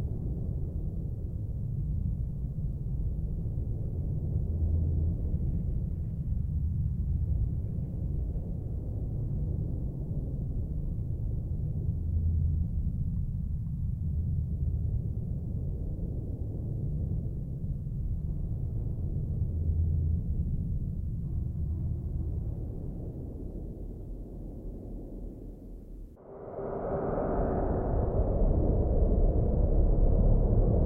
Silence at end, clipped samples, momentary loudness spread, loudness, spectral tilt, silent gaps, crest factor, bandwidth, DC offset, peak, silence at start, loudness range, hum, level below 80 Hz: 0 s; under 0.1%; 12 LU; -33 LUFS; -12.5 dB/octave; none; 16 dB; 1.9 kHz; under 0.1%; -14 dBFS; 0 s; 7 LU; none; -34 dBFS